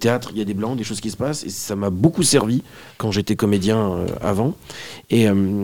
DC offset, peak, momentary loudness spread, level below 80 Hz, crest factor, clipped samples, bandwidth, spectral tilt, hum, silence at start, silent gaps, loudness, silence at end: 0.4%; 0 dBFS; 10 LU; -48 dBFS; 20 dB; under 0.1%; 18 kHz; -5 dB/octave; none; 0 s; none; -20 LUFS; 0 s